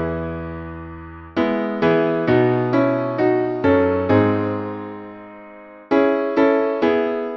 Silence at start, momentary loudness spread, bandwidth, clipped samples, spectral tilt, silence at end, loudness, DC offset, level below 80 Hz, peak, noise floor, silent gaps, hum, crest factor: 0 s; 18 LU; 6.6 kHz; under 0.1%; -9 dB/octave; 0 s; -19 LUFS; under 0.1%; -46 dBFS; -4 dBFS; -40 dBFS; none; none; 16 dB